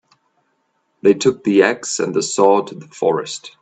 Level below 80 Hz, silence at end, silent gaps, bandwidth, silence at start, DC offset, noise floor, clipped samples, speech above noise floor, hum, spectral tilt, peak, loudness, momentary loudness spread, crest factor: -64 dBFS; 0.1 s; none; 9.2 kHz; 1.05 s; under 0.1%; -67 dBFS; under 0.1%; 50 dB; none; -4 dB/octave; 0 dBFS; -17 LUFS; 8 LU; 18 dB